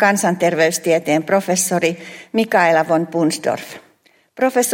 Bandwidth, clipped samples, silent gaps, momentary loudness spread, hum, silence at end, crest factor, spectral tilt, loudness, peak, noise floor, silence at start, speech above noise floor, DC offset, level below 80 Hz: 16.5 kHz; under 0.1%; none; 9 LU; none; 0 s; 16 dB; -4 dB/octave; -17 LUFS; -2 dBFS; -56 dBFS; 0 s; 39 dB; under 0.1%; -66 dBFS